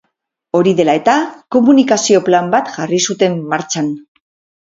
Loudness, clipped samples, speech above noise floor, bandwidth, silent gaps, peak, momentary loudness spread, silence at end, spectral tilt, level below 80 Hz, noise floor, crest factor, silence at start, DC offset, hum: -13 LUFS; under 0.1%; 57 dB; 7.8 kHz; none; 0 dBFS; 8 LU; 0.65 s; -4.5 dB/octave; -60 dBFS; -70 dBFS; 14 dB; 0.55 s; under 0.1%; none